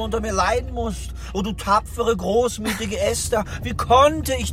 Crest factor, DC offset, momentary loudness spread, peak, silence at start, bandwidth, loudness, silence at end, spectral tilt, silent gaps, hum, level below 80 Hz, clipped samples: 16 dB; 0.2%; 12 LU; -4 dBFS; 0 s; 16 kHz; -21 LUFS; 0 s; -4.5 dB/octave; none; none; -32 dBFS; under 0.1%